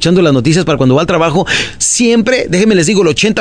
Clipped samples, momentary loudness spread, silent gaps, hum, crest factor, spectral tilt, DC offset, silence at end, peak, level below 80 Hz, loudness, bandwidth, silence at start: under 0.1%; 3 LU; none; none; 10 dB; -4.5 dB/octave; 1%; 0 s; 0 dBFS; -38 dBFS; -10 LUFS; 10.5 kHz; 0 s